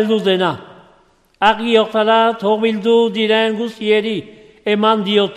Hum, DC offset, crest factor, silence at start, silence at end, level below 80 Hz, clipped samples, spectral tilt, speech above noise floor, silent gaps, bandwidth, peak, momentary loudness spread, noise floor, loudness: none; under 0.1%; 16 dB; 0 s; 0 s; -56 dBFS; under 0.1%; -5.5 dB/octave; 38 dB; none; 11.5 kHz; 0 dBFS; 7 LU; -53 dBFS; -15 LUFS